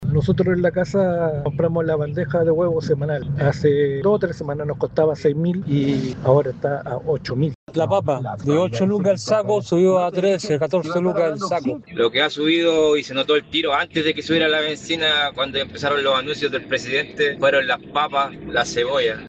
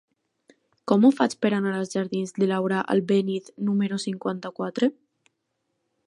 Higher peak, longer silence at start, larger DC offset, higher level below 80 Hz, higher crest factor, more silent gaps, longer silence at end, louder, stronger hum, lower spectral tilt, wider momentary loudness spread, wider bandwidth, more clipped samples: first, -2 dBFS vs -6 dBFS; second, 0 s vs 0.85 s; neither; first, -50 dBFS vs -76 dBFS; about the same, 16 dB vs 20 dB; first, 7.55-7.67 s vs none; second, 0 s vs 1.15 s; first, -20 LUFS vs -24 LUFS; neither; about the same, -6 dB/octave vs -6.5 dB/octave; second, 6 LU vs 11 LU; second, 8.6 kHz vs 11 kHz; neither